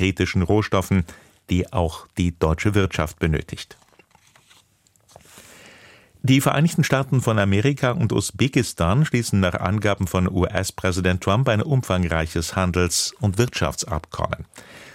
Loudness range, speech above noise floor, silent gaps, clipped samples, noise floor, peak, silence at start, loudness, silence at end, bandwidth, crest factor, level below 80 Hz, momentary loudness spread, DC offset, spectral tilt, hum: 6 LU; 39 dB; none; under 0.1%; -60 dBFS; -4 dBFS; 0 s; -21 LUFS; 0.05 s; 16.5 kHz; 18 dB; -40 dBFS; 8 LU; under 0.1%; -5.5 dB/octave; none